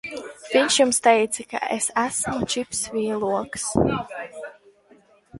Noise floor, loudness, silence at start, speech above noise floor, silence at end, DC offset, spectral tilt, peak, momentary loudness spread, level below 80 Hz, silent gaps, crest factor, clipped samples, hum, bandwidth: -55 dBFS; -22 LUFS; 0.05 s; 33 dB; 0 s; under 0.1%; -3 dB/octave; -4 dBFS; 17 LU; -50 dBFS; none; 20 dB; under 0.1%; none; 12 kHz